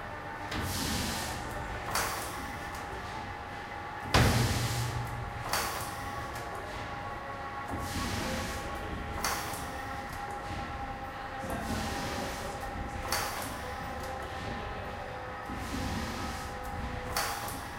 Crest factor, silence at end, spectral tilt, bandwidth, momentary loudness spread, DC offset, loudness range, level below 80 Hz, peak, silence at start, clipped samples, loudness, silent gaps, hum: 26 dB; 0 s; -4 dB/octave; 16.5 kHz; 7 LU; under 0.1%; 5 LU; -44 dBFS; -10 dBFS; 0 s; under 0.1%; -35 LUFS; none; none